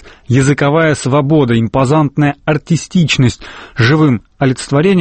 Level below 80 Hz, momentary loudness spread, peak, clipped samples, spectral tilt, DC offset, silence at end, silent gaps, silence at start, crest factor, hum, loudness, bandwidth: -40 dBFS; 5 LU; 0 dBFS; under 0.1%; -6 dB/octave; under 0.1%; 0 s; none; 0.05 s; 12 dB; none; -12 LUFS; 8.8 kHz